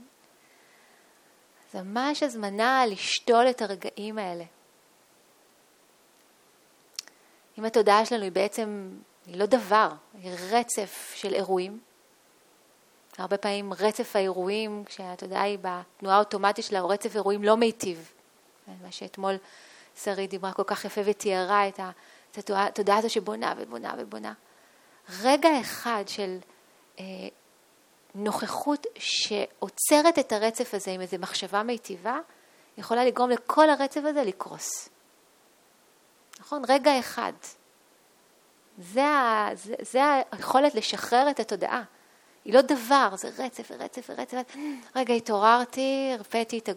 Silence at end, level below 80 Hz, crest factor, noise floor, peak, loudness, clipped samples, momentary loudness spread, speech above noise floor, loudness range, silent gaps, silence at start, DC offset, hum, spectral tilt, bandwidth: 0 s; -78 dBFS; 24 dB; -61 dBFS; -4 dBFS; -26 LUFS; under 0.1%; 18 LU; 35 dB; 6 LU; none; 0 s; under 0.1%; none; -3 dB/octave; 19 kHz